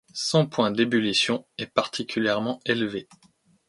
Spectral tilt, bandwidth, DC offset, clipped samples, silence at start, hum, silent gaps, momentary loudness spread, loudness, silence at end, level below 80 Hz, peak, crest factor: -4.5 dB/octave; 11.5 kHz; under 0.1%; under 0.1%; 0.15 s; none; none; 7 LU; -24 LUFS; 0.65 s; -66 dBFS; -6 dBFS; 20 dB